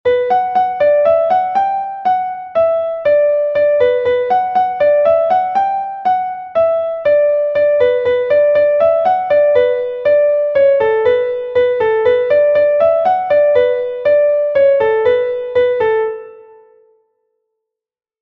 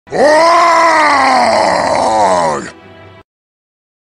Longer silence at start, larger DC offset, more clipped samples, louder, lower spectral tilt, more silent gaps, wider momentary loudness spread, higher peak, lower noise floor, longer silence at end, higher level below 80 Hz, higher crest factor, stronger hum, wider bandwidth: about the same, 0.05 s vs 0.1 s; neither; neither; second, -13 LUFS vs -9 LUFS; first, -6 dB/octave vs -3 dB/octave; neither; about the same, 5 LU vs 7 LU; about the same, -2 dBFS vs 0 dBFS; first, -86 dBFS vs -37 dBFS; first, 1.8 s vs 1.3 s; second, -54 dBFS vs -48 dBFS; about the same, 12 dB vs 10 dB; neither; second, 5.6 kHz vs 13 kHz